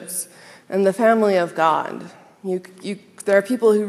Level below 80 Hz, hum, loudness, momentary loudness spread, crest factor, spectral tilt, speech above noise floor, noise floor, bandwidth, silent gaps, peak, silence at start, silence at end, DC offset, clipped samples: -78 dBFS; none; -20 LUFS; 15 LU; 18 dB; -5 dB/octave; 20 dB; -39 dBFS; 14.5 kHz; none; -2 dBFS; 0 s; 0 s; under 0.1%; under 0.1%